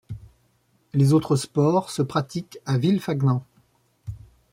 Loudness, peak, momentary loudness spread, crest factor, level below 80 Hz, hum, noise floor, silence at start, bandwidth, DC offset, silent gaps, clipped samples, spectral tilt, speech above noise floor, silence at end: -23 LUFS; -8 dBFS; 21 LU; 16 dB; -54 dBFS; none; -65 dBFS; 0.1 s; 15.5 kHz; under 0.1%; none; under 0.1%; -7 dB/octave; 43 dB; 0.35 s